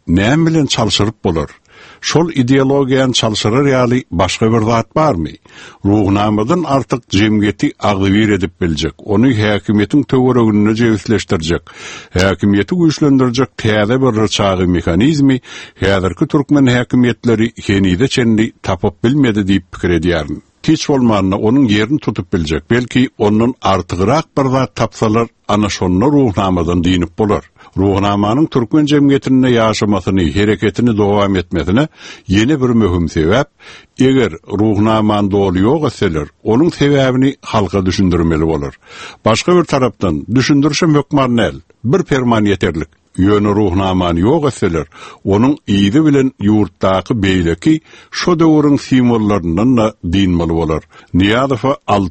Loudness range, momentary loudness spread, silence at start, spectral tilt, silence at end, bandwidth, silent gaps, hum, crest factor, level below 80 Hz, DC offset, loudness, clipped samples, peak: 2 LU; 6 LU; 0.05 s; -6 dB/octave; 0 s; 8.8 kHz; none; none; 12 dB; -36 dBFS; under 0.1%; -13 LUFS; under 0.1%; 0 dBFS